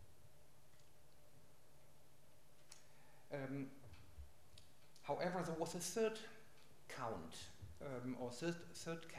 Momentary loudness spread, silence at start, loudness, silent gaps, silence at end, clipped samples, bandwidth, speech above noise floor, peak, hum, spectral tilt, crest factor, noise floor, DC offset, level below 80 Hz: 23 LU; 0 s; -47 LUFS; none; 0 s; under 0.1%; 15.5 kHz; 25 dB; -30 dBFS; none; -4.5 dB/octave; 20 dB; -71 dBFS; 0.1%; -72 dBFS